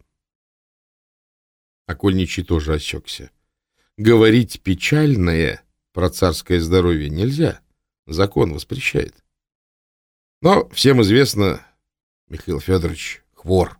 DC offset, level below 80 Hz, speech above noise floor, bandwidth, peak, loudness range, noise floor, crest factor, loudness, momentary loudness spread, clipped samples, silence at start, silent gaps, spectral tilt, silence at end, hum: under 0.1%; -36 dBFS; 52 dB; 18 kHz; 0 dBFS; 6 LU; -69 dBFS; 18 dB; -18 LUFS; 18 LU; under 0.1%; 1.9 s; 7.99-8.03 s, 9.55-10.41 s, 12.03-12.27 s; -6 dB/octave; 0.05 s; none